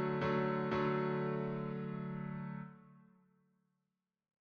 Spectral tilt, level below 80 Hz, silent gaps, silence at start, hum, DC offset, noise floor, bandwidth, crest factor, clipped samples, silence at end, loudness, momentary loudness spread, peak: -9 dB/octave; -70 dBFS; none; 0 s; none; under 0.1%; -89 dBFS; 6.4 kHz; 16 dB; under 0.1%; 1.4 s; -38 LUFS; 11 LU; -24 dBFS